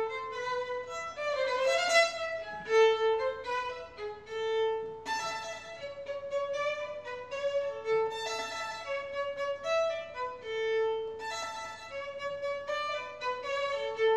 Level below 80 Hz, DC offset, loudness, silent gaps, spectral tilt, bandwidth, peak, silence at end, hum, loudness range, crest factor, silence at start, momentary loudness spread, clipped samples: -70 dBFS; under 0.1%; -33 LUFS; none; -1 dB/octave; 12 kHz; -14 dBFS; 0 s; none; 6 LU; 18 dB; 0 s; 14 LU; under 0.1%